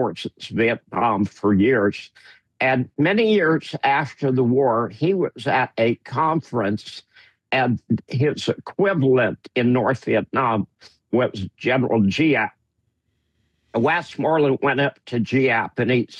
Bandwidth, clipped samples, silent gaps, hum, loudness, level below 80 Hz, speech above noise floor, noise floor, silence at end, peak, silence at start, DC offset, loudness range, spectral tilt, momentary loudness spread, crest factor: 9.8 kHz; under 0.1%; none; none; -21 LUFS; -64 dBFS; 51 dB; -71 dBFS; 0 s; -8 dBFS; 0 s; under 0.1%; 3 LU; -7 dB/octave; 8 LU; 12 dB